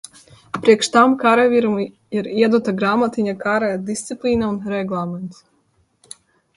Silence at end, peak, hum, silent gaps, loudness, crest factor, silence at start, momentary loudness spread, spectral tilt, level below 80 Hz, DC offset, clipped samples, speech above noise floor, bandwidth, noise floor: 1.25 s; 0 dBFS; none; none; -18 LUFS; 18 dB; 0.55 s; 12 LU; -5 dB/octave; -54 dBFS; under 0.1%; under 0.1%; 45 dB; 11.5 kHz; -62 dBFS